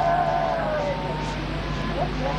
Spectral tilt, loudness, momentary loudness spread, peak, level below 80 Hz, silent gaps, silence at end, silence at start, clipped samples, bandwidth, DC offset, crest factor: -6.5 dB/octave; -26 LUFS; 6 LU; -12 dBFS; -34 dBFS; none; 0 s; 0 s; under 0.1%; 10.5 kHz; under 0.1%; 12 dB